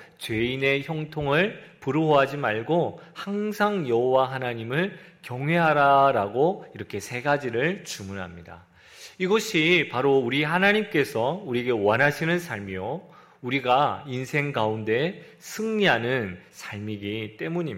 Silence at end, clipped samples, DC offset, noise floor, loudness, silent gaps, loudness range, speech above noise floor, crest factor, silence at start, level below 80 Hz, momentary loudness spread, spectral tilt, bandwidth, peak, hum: 0 s; under 0.1%; under 0.1%; -48 dBFS; -24 LUFS; none; 4 LU; 24 dB; 18 dB; 0 s; -62 dBFS; 15 LU; -5.5 dB/octave; 16 kHz; -6 dBFS; none